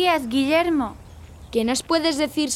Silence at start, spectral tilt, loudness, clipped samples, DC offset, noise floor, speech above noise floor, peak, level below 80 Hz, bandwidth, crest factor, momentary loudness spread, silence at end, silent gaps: 0 s; -3 dB/octave; -22 LUFS; under 0.1%; under 0.1%; -42 dBFS; 21 dB; -8 dBFS; -48 dBFS; 16 kHz; 14 dB; 6 LU; 0 s; none